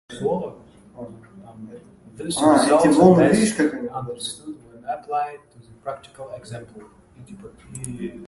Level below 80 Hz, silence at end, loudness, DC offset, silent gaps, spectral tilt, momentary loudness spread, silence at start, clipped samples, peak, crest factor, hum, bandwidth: -54 dBFS; 0 s; -19 LUFS; under 0.1%; none; -5.5 dB/octave; 26 LU; 0.1 s; under 0.1%; -2 dBFS; 22 dB; none; 11.5 kHz